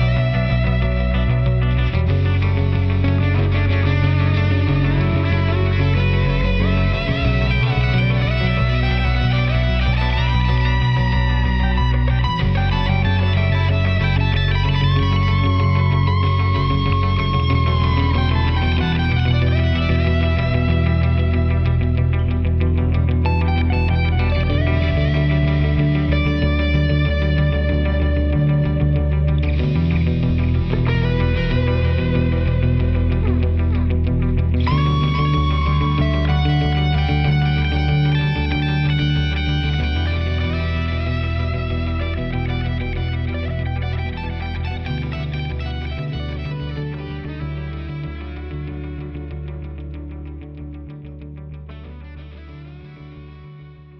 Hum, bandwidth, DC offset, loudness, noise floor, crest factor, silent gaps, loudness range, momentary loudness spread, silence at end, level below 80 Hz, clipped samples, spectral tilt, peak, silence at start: none; 6 kHz; under 0.1%; -19 LUFS; -40 dBFS; 14 dB; none; 10 LU; 12 LU; 0 s; -24 dBFS; under 0.1%; -8.5 dB/octave; -4 dBFS; 0 s